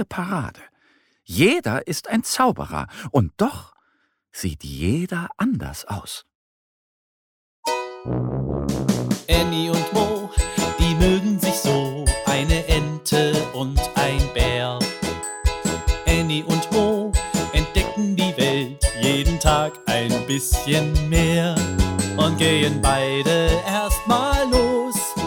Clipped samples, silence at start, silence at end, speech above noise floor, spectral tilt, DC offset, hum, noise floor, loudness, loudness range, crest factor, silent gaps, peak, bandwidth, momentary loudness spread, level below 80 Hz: under 0.1%; 0 s; 0 s; 47 dB; -4.5 dB/octave; under 0.1%; none; -67 dBFS; -21 LUFS; 9 LU; 18 dB; 6.35-7.63 s; -4 dBFS; 17.5 kHz; 9 LU; -28 dBFS